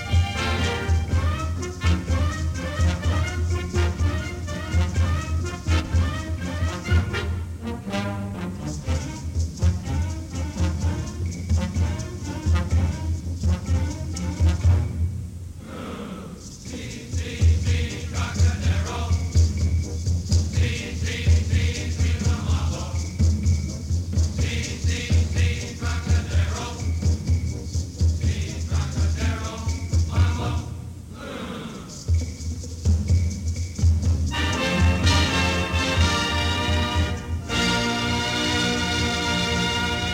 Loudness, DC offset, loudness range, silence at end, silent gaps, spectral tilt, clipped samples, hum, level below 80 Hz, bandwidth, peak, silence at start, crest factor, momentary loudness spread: -24 LUFS; under 0.1%; 5 LU; 0 s; none; -5 dB/octave; under 0.1%; none; -28 dBFS; 11.5 kHz; -6 dBFS; 0 s; 16 dB; 9 LU